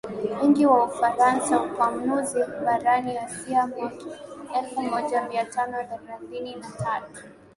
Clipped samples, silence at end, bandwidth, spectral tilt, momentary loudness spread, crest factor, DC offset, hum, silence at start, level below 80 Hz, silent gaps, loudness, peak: under 0.1%; 0.25 s; 11.5 kHz; -5 dB/octave; 16 LU; 18 dB; under 0.1%; none; 0.05 s; -64 dBFS; none; -24 LUFS; -6 dBFS